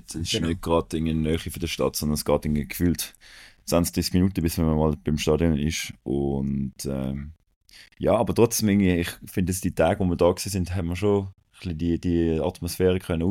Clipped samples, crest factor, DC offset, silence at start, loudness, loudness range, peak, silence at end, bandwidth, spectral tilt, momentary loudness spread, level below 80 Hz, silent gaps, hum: under 0.1%; 20 dB; under 0.1%; 0.1 s; -25 LUFS; 3 LU; -4 dBFS; 0 s; 17 kHz; -5.5 dB/octave; 8 LU; -40 dBFS; 7.56-7.61 s; none